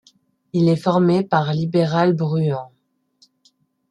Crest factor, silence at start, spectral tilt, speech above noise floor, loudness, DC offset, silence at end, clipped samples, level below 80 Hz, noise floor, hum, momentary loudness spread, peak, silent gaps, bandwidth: 18 dB; 0.55 s; -8 dB/octave; 44 dB; -19 LUFS; under 0.1%; 1.25 s; under 0.1%; -62 dBFS; -61 dBFS; none; 6 LU; -2 dBFS; none; 9.6 kHz